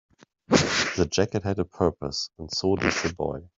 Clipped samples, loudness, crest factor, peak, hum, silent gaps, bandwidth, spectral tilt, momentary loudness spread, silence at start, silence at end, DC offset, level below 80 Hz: under 0.1%; -25 LUFS; 22 dB; -4 dBFS; none; none; 8 kHz; -4 dB/octave; 8 LU; 0.5 s; 0.1 s; under 0.1%; -50 dBFS